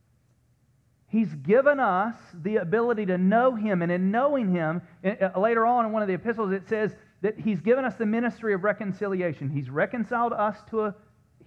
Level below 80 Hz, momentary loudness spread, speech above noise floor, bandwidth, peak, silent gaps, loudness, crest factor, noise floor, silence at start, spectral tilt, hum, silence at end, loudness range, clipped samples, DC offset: -68 dBFS; 8 LU; 40 dB; 6.6 kHz; -8 dBFS; none; -26 LUFS; 18 dB; -65 dBFS; 1.15 s; -9 dB/octave; none; 0.55 s; 3 LU; under 0.1%; under 0.1%